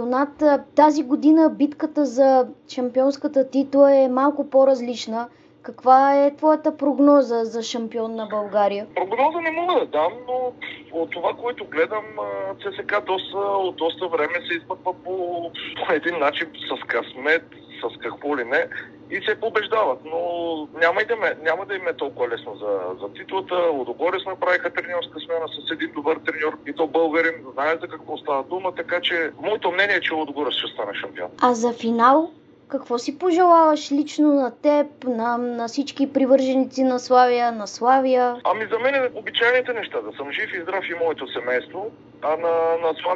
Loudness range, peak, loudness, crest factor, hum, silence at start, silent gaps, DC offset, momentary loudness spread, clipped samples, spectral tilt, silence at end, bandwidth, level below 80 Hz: 6 LU; -2 dBFS; -21 LUFS; 20 dB; none; 0 s; none; under 0.1%; 12 LU; under 0.1%; -4 dB/octave; 0 s; 8 kHz; -68 dBFS